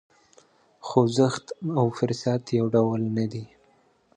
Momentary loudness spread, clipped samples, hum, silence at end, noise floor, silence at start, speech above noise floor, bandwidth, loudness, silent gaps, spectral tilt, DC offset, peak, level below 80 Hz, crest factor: 10 LU; under 0.1%; none; 0.7 s; -62 dBFS; 0.85 s; 38 dB; 9.8 kHz; -25 LUFS; none; -7 dB/octave; under 0.1%; -4 dBFS; -64 dBFS; 22 dB